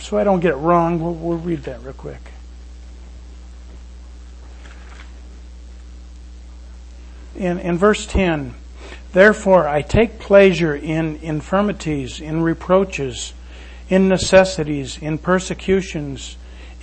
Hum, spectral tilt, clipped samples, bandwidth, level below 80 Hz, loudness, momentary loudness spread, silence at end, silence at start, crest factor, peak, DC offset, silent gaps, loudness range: none; -5.5 dB/octave; under 0.1%; 8.8 kHz; -34 dBFS; -17 LUFS; 27 LU; 0 s; 0 s; 20 dB; 0 dBFS; under 0.1%; none; 24 LU